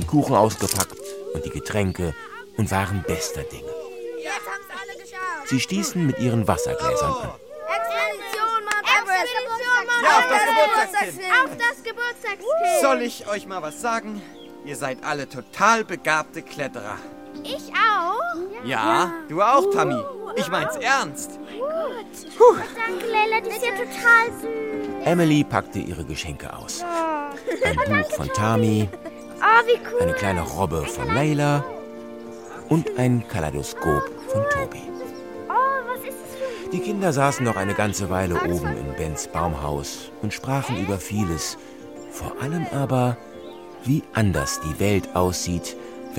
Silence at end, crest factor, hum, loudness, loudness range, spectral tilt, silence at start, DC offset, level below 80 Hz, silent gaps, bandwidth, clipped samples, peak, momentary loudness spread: 0 s; 20 dB; none; -22 LUFS; 7 LU; -4.5 dB/octave; 0 s; 0.2%; -46 dBFS; none; 16.5 kHz; under 0.1%; -2 dBFS; 16 LU